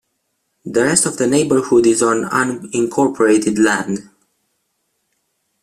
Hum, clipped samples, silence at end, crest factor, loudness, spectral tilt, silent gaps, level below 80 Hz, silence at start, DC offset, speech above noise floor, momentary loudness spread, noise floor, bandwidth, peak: none; under 0.1%; 1.6 s; 18 dB; -15 LUFS; -4 dB/octave; none; -56 dBFS; 0.65 s; under 0.1%; 55 dB; 8 LU; -70 dBFS; 14 kHz; 0 dBFS